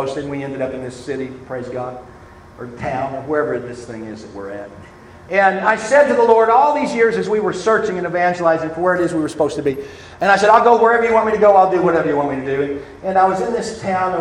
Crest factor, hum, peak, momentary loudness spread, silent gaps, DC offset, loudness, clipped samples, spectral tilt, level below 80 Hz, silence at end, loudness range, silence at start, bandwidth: 16 dB; none; 0 dBFS; 19 LU; none; under 0.1%; -16 LUFS; under 0.1%; -5.5 dB/octave; -50 dBFS; 0 s; 11 LU; 0 s; 11 kHz